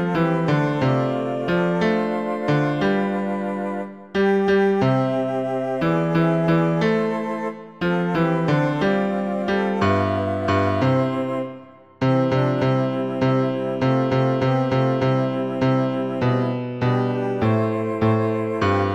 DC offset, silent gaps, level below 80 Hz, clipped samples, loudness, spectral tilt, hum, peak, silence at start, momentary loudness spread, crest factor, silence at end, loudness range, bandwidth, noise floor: 0.2%; none; -54 dBFS; under 0.1%; -21 LUFS; -8 dB/octave; none; -8 dBFS; 0 s; 6 LU; 12 dB; 0 s; 1 LU; 9 kHz; -42 dBFS